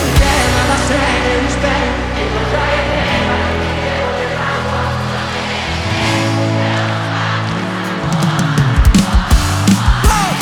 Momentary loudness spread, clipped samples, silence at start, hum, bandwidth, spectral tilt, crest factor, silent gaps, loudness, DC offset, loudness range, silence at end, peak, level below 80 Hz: 6 LU; under 0.1%; 0 s; none; 18.5 kHz; -5 dB/octave; 14 dB; none; -14 LUFS; under 0.1%; 3 LU; 0 s; 0 dBFS; -20 dBFS